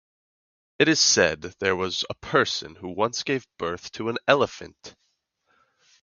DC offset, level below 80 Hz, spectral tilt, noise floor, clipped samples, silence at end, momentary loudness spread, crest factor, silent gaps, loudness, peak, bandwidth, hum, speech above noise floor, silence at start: under 0.1%; -56 dBFS; -2.5 dB/octave; -73 dBFS; under 0.1%; 1.15 s; 13 LU; 24 dB; none; -23 LUFS; -2 dBFS; 10 kHz; none; 48 dB; 0.8 s